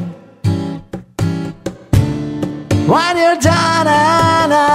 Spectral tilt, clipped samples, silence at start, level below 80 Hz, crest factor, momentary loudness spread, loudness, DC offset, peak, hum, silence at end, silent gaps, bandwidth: -5.5 dB/octave; under 0.1%; 0 s; -34 dBFS; 14 dB; 14 LU; -14 LUFS; under 0.1%; 0 dBFS; none; 0 s; none; 15.5 kHz